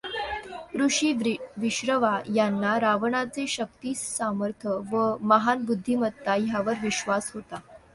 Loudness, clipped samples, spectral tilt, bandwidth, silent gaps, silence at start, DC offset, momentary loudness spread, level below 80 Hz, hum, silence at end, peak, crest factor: -26 LUFS; under 0.1%; -4 dB/octave; 11.5 kHz; none; 0.05 s; under 0.1%; 9 LU; -60 dBFS; none; 0.15 s; -6 dBFS; 20 dB